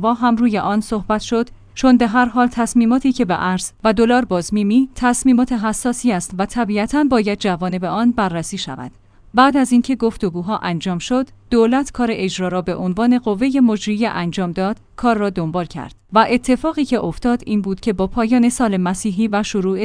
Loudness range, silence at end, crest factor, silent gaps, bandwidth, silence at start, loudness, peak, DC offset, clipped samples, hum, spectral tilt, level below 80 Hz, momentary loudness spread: 3 LU; 0 s; 16 dB; none; 10.5 kHz; 0 s; -17 LUFS; 0 dBFS; under 0.1%; under 0.1%; none; -5.5 dB/octave; -40 dBFS; 7 LU